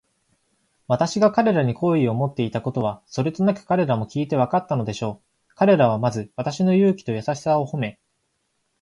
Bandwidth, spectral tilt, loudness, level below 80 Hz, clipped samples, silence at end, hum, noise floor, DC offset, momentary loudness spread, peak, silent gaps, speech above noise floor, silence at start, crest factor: 11 kHz; -7 dB/octave; -22 LUFS; -58 dBFS; under 0.1%; 0.9 s; none; -72 dBFS; under 0.1%; 10 LU; -4 dBFS; none; 51 dB; 0.9 s; 18 dB